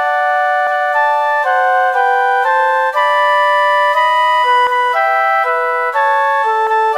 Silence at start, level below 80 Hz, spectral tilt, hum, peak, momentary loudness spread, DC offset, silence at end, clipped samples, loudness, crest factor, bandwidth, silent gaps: 0 s; -72 dBFS; 1.5 dB/octave; none; -2 dBFS; 3 LU; 0.2%; 0 s; under 0.1%; -12 LUFS; 10 dB; 15.5 kHz; none